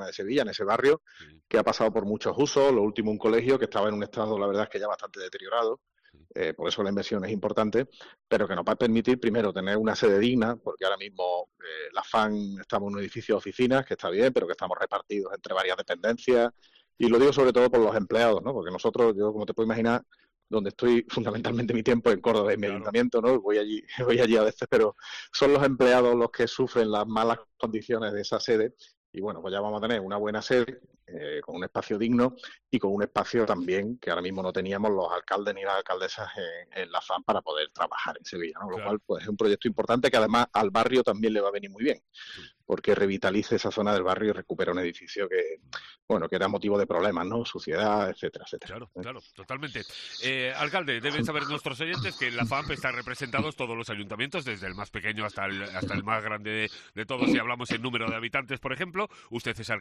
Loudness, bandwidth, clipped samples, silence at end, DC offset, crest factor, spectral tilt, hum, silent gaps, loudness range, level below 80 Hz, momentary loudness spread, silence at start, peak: -27 LUFS; 12 kHz; under 0.1%; 0 s; under 0.1%; 16 dB; -5.5 dB/octave; none; 28.97-29.13 s, 46.02-46.08 s; 7 LU; -60 dBFS; 12 LU; 0 s; -12 dBFS